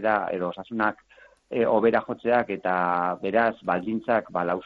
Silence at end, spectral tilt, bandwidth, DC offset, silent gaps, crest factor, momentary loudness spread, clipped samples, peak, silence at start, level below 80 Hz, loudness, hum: 0 s; -8.5 dB/octave; 5.2 kHz; under 0.1%; none; 18 dB; 6 LU; under 0.1%; -8 dBFS; 0 s; -64 dBFS; -25 LUFS; none